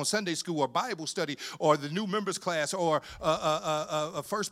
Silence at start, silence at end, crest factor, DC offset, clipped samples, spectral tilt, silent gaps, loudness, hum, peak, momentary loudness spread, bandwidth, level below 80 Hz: 0 s; 0 s; 20 dB; under 0.1%; under 0.1%; -3.5 dB/octave; none; -30 LUFS; none; -10 dBFS; 6 LU; 16 kHz; -62 dBFS